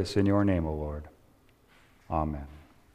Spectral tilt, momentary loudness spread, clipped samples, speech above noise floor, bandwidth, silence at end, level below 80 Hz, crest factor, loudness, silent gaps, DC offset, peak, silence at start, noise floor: -7.5 dB/octave; 17 LU; under 0.1%; 33 dB; 11 kHz; 0.3 s; -44 dBFS; 20 dB; -30 LUFS; none; under 0.1%; -12 dBFS; 0 s; -61 dBFS